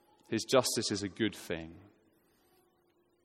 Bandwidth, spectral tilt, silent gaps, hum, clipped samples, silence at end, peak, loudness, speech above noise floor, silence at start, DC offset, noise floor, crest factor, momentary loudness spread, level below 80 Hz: 16.5 kHz; -3.5 dB/octave; none; none; under 0.1%; 1.45 s; -12 dBFS; -33 LUFS; 39 dB; 0.3 s; under 0.1%; -72 dBFS; 24 dB; 13 LU; -70 dBFS